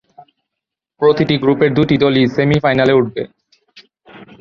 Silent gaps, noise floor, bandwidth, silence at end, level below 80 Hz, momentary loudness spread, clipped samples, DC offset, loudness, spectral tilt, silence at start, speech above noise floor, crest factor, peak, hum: none; -81 dBFS; 7 kHz; 0.15 s; -46 dBFS; 6 LU; under 0.1%; under 0.1%; -14 LUFS; -8 dB/octave; 1 s; 68 dB; 14 dB; -2 dBFS; none